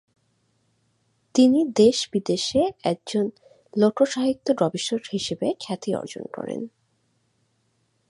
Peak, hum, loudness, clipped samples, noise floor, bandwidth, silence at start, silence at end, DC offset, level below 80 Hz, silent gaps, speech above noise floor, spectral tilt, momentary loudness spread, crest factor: -6 dBFS; none; -23 LUFS; under 0.1%; -69 dBFS; 11.5 kHz; 1.35 s; 1.4 s; under 0.1%; -62 dBFS; none; 47 dB; -5 dB/octave; 14 LU; 20 dB